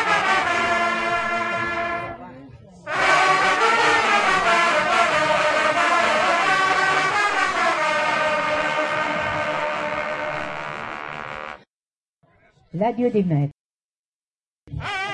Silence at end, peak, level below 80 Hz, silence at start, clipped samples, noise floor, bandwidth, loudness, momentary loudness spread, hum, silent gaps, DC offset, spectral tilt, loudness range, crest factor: 0 s; -4 dBFS; -54 dBFS; 0 s; under 0.1%; under -90 dBFS; 11.5 kHz; -20 LUFS; 14 LU; none; 11.67-11.91 s, 11.97-12.21 s, 13.54-14.67 s; under 0.1%; -3.5 dB/octave; 10 LU; 16 dB